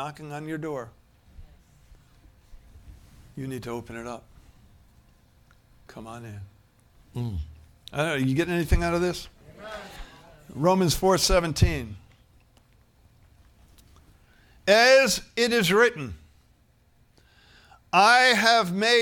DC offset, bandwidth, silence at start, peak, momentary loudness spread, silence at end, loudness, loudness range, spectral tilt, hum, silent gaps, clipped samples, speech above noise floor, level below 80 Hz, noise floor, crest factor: under 0.1%; 18 kHz; 0 s; -6 dBFS; 25 LU; 0 s; -22 LUFS; 18 LU; -4 dB/octave; none; none; under 0.1%; 38 dB; -40 dBFS; -61 dBFS; 22 dB